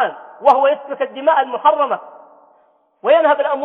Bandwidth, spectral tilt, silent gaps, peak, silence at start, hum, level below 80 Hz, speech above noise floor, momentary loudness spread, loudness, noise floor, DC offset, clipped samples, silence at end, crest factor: 5 kHz; -5 dB/octave; none; 0 dBFS; 0 s; none; -74 dBFS; 41 dB; 10 LU; -16 LUFS; -56 dBFS; under 0.1%; under 0.1%; 0 s; 16 dB